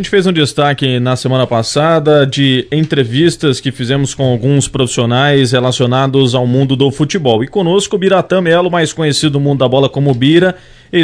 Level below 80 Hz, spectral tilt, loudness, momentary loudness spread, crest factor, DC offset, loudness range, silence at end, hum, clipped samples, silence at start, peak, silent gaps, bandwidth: -42 dBFS; -5.5 dB/octave; -12 LUFS; 4 LU; 12 dB; under 0.1%; 1 LU; 0 s; none; 0.4%; 0 s; 0 dBFS; none; 11 kHz